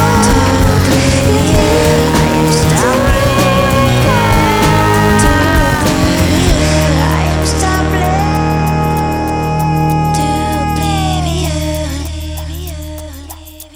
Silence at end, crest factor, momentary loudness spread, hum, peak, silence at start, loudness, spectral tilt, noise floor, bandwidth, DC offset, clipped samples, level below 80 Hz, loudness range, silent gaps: 0.1 s; 12 dB; 12 LU; none; 0 dBFS; 0 s; -11 LUFS; -5 dB/octave; -31 dBFS; 20 kHz; under 0.1%; under 0.1%; -22 dBFS; 5 LU; none